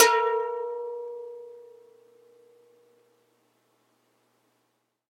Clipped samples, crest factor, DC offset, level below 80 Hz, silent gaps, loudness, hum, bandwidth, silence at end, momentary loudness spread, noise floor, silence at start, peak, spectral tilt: under 0.1%; 28 dB; under 0.1%; under -90 dBFS; none; -28 LUFS; none; 16 kHz; 3.5 s; 24 LU; -75 dBFS; 0 s; -2 dBFS; 1.5 dB/octave